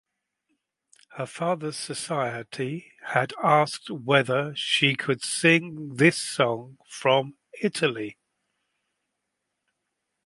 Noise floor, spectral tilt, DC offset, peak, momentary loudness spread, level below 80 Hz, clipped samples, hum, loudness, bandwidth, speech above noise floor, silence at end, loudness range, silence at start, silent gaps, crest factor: -81 dBFS; -4 dB/octave; under 0.1%; -4 dBFS; 14 LU; -72 dBFS; under 0.1%; none; -24 LUFS; 11.5 kHz; 56 dB; 2.15 s; 7 LU; 1.15 s; none; 24 dB